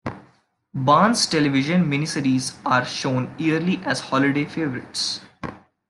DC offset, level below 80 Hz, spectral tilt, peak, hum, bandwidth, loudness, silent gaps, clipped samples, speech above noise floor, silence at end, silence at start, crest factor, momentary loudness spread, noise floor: under 0.1%; -60 dBFS; -4.5 dB/octave; -4 dBFS; none; 12.5 kHz; -21 LUFS; none; under 0.1%; 38 dB; 0.3 s; 0.05 s; 18 dB; 13 LU; -59 dBFS